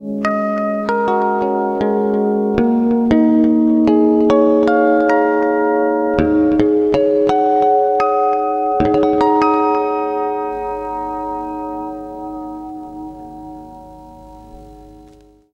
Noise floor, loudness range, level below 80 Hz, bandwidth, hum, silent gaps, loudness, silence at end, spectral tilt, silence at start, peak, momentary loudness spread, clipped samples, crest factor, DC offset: -45 dBFS; 15 LU; -44 dBFS; 7 kHz; none; none; -15 LUFS; 0.55 s; -8 dB/octave; 0 s; 0 dBFS; 16 LU; under 0.1%; 16 dB; under 0.1%